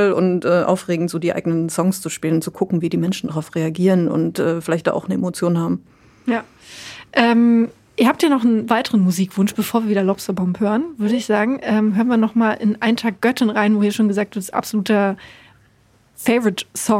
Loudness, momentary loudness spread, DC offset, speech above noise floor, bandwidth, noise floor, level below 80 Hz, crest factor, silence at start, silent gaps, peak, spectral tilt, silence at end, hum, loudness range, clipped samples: -18 LUFS; 7 LU; under 0.1%; 37 dB; 16 kHz; -55 dBFS; -60 dBFS; 16 dB; 0 s; none; -2 dBFS; -6 dB/octave; 0 s; none; 3 LU; under 0.1%